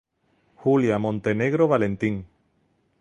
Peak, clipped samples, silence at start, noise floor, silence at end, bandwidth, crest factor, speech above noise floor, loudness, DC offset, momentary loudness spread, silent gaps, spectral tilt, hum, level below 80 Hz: -6 dBFS; under 0.1%; 0.6 s; -67 dBFS; 0.75 s; 9.2 kHz; 18 dB; 46 dB; -23 LUFS; under 0.1%; 7 LU; none; -8 dB/octave; none; -56 dBFS